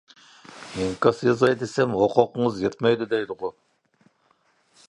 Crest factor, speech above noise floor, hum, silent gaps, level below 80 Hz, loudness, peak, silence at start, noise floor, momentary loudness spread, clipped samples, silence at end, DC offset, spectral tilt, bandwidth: 22 dB; 43 dB; none; none; -58 dBFS; -23 LUFS; -2 dBFS; 0.5 s; -65 dBFS; 13 LU; under 0.1%; 1.35 s; under 0.1%; -6 dB/octave; 11 kHz